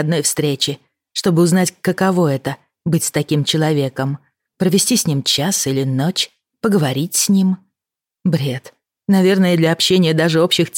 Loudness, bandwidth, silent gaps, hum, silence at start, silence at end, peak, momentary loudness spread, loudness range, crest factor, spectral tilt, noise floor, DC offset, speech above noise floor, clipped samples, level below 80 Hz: -16 LUFS; 17.5 kHz; none; none; 0 s; 0 s; -4 dBFS; 10 LU; 2 LU; 14 dB; -4.5 dB/octave; -86 dBFS; under 0.1%; 71 dB; under 0.1%; -58 dBFS